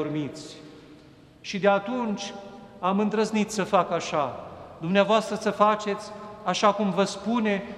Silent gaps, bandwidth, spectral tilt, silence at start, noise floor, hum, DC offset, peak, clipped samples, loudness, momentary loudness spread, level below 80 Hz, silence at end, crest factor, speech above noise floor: none; 12.5 kHz; -5 dB/octave; 0 s; -51 dBFS; none; under 0.1%; -6 dBFS; under 0.1%; -25 LUFS; 18 LU; -64 dBFS; 0 s; 20 dB; 26 dB